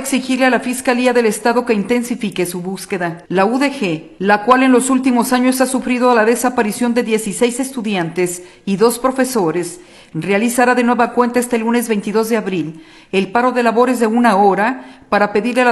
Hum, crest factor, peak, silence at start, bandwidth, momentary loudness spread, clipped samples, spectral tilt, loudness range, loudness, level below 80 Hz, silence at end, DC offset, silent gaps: none; 14 dB; 0 dBFS; 0 s; 13 kHz; 9 LU; under 0.1%; -4.5 dB/octave; 3 LU; -15 LUFS; -54 dBFS; 0 s; under 0.1%; none